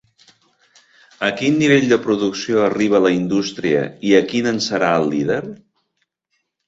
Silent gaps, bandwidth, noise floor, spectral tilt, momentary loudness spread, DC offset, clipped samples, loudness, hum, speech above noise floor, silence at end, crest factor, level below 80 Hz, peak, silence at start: none; 8 kHz; -72 dBFS; -5 dB/octave; 7 LU; under 0.1%; under 0.1%; -17 LUFS; none; 55 dB; 1.1 s; 16 dB; -58 dBFS; -2 dBFS; 1.2 s